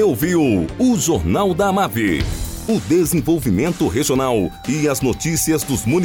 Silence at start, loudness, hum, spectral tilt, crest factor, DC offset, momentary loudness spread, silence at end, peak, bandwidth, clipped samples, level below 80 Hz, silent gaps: 0 s; -18 LUFS; none; -5 dB/octave; 10 dB; under 0.1%; 5 LU; 0 s; -6 dBFS; 18 kHz; under 0.1%; -34 dBFS; none